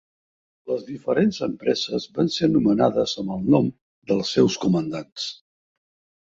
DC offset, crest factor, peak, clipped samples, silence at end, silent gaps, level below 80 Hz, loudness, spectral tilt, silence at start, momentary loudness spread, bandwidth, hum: under 0.1%; 20 dB; -4 dBFS; under 0.1%; 0.95 s; 3.81-4.02 s; -58 dBFS; -23 LUFS; -6 dB/octave; 0.65 s; 10 LU; 7.8 kHz; none